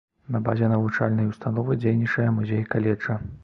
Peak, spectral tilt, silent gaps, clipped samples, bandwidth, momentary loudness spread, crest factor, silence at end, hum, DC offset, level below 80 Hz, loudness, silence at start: -6 dBFS; -9.5 dB/octave; none; under 0.1%; 6.2 kHz; 5 LU; 18 dB; 0.05 s; none; under 0.1%; -52 dBFS; -24 LUFS; 0.3 s